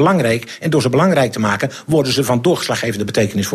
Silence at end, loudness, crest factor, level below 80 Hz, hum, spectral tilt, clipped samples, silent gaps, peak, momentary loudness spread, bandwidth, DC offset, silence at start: 0 s; -16 LUFS; 14 dB; -50 dBFS; none; -5.5 dB/octave; under 0.1%; none; -2 dBFS; 5 LU; 14.5 kHz; under 0.1%; 0 s